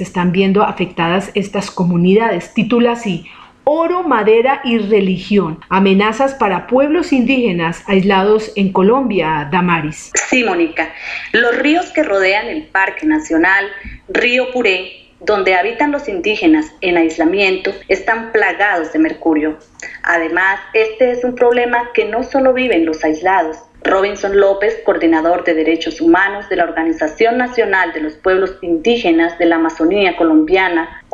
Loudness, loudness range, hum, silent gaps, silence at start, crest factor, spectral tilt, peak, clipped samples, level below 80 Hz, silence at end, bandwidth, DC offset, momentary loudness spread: -14 LUFS; 1 LU; none; none; 0 s; 12 dB; -5 dB/octave; -2 dBFS; under 0.1%; -44 dBFS; 0.1 s; 9.2 kHz; under 0.1%; 6 LU